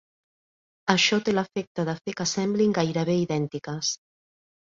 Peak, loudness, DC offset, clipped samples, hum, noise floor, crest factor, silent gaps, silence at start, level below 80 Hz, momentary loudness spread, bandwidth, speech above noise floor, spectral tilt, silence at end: -4 dBFS; -25 LUFS; under 0.1%; under 0.1%; none; under -90 dBFS; 24 dB; 1.67-1.75 s; 0.85 s; -64 dBFS; 10 LU; 7.8 kHz; over 65 dB; -4 dB/octave; 0.75 s